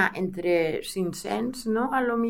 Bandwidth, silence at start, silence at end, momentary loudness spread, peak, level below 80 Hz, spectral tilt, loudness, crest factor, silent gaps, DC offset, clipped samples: 17 kHz; 0 s; 0 s; 5 LU; -8 dBFS; -54 dBFS; -5 dB/octave; -27 LUFS; 18 dB; none; under 0.1%; under 0.1%